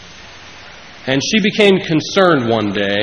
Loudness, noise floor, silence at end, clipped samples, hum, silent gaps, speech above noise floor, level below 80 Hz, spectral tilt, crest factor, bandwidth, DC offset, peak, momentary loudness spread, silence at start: -14 LUFS; -37 dBFS; 0 s; under 0.1%; none; none; 23 dB; -50 dBFS; -4.5 dB/octave; 16 dB; 10.5 kHz; under 0.1%; 0 dBFS; 23 LU; 0 s